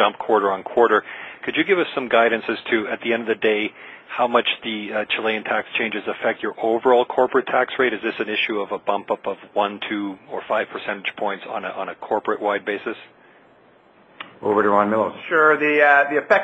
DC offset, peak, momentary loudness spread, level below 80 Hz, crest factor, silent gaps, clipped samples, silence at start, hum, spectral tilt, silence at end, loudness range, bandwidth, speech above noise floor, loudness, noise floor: under 0.1%; -2 dBFS; 11 LU; -68 dBFS; 20 dB; none; under 0.1%; 0 s; none; -6 dB/octave; 0 s; 6 LU; 7.8 kHz; 32 dB; -21 LUFS; -53 dBFS